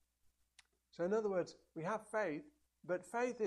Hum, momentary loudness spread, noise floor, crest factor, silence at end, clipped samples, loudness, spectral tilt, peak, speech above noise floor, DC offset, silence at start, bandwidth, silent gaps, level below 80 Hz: none; 11 LU; -77 dBFS; 16 dB; 0 s; under 0.1%; -41 LUFS; -6 dB/octave; -26 dBFS; 37 dB; under 0.1%; 1 s; 12.5 kHz; none; -82 dBFS